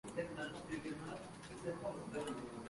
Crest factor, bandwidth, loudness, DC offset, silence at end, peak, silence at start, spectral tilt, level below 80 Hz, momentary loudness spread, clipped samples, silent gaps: 18 dB; 11.5 kHz; -46 LUFS; under 0.1%; 0 s; -28 dBFS; 0.05 s; -5 dB/octave; -68 dBFS; 4 LU; under 0.1%; none